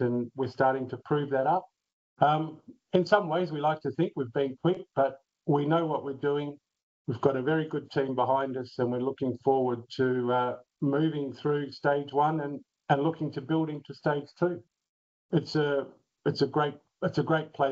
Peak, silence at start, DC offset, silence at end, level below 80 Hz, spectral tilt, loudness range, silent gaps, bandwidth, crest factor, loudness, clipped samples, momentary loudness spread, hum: -8 dBFS; 0 s; under 0.1%; 0 s; -74 dBFS; -5.5 dB/octave; 3 LU; 1.93-2.16 s, 6.83-7.05 s, 14.89-15.29 s; 7.6 kHz; 20 dB; -29 LUFS; under 0.1%; 8 LU; none